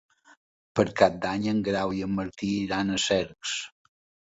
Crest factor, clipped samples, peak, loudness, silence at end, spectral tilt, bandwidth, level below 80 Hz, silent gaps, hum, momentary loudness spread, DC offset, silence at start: 24 dB; under 0.1%; -4 dBFS; -27 LUFS; 0.55 s; -4.5 dB/octave; 8 kHz; -56 dBFS; none; none; 9 LU; under 0.1%; 0.75 s